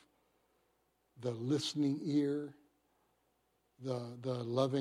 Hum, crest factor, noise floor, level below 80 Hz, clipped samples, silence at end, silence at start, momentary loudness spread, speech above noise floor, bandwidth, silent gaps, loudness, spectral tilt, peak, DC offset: none; 20 dB; -78 dBFS; -84 dBFS; under 0.1%; 0 s; 1.2 s; 9 LU; 42 dB; 12.5 kHz; none; -37 LUFS; -6.5 dB/octave; -18 dBFS; under 0.1%